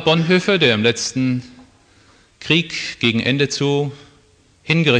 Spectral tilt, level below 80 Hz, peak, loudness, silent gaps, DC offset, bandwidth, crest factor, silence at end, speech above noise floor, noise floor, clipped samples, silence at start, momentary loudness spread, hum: -4.5 dB/octave; -56 dBFS; -2 dBFS; -17 LUFS; none; under 0.1%; 9.8 kHz; 18 dB; 0 s; 36 dB; -53 dBFS; under 0.1%; 0 s; 9 LU; none